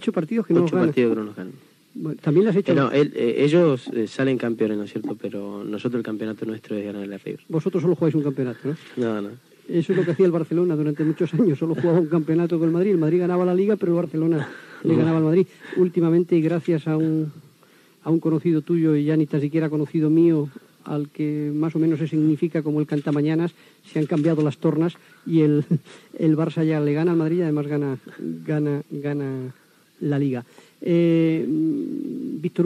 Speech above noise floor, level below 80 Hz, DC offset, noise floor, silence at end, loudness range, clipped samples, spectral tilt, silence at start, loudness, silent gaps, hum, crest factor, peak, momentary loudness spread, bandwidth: 33 dB; -88 dBFS; under 0.1%; -55 dBFS; 0 s; 5 LU; under 0.1%; -9 dB/octave; 0 s; -22 LUFS; none; none; 14 dB; -6 dBFS; 12 LU; 9.6 kHz